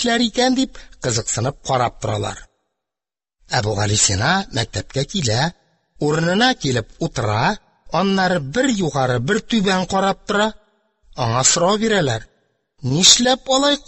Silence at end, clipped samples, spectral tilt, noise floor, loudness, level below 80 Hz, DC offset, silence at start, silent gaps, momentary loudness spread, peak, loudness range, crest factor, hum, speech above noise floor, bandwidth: 0.1 s; under 0.1%; -3.5 dB/octave; -90 dBFS; -18 LUFS; -44 dBFS; under 0.1%; 0 s; none; 10 LU; 0 dBFS; 4 LU; 20 dB; none; 72 dB; 16 kHz